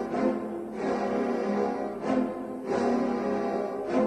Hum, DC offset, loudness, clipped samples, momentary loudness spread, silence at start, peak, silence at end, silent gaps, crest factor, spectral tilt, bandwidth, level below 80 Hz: none; under 0.1%; -29 LUFS; under 0.1%; 6 LU; 0 s; -14 dBFS; 0 s; none; 14 dB; -7 dB/octave; 11 kHz; -60 dBFS